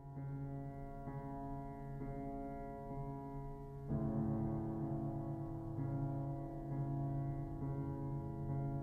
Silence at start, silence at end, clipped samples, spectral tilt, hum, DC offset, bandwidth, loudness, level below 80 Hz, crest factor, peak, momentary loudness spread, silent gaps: 0 s; 0 s; under 0.1%; -11.5 dB/octave; none; under 0.1%; 2.4 kHz; -44 LUFS; -54 dBFS; 14 dB; -28 dBFS; 8 LU; none